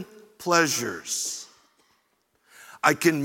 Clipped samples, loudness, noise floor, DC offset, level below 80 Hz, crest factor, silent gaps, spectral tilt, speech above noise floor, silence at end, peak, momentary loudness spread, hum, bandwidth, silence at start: under 0.1%; -24 LUFS; -70 dBFS; under 0.1%; -74 dBFS; 24 dB; none; -3 dB/octave; 46 dB; 0 s; -4 dBFS; 17 LU; none; 17 kHz; 0 s